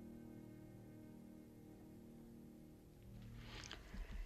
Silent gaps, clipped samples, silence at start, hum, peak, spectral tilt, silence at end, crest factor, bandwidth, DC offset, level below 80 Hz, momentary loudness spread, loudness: none; under 0.1%; 0 s; none; -34 dBFS; -5 dB/octave; 0 s; 22 dB; 14.5 kHz; under 0.1%; -60 dBFS; 7 LU; -58 LUFS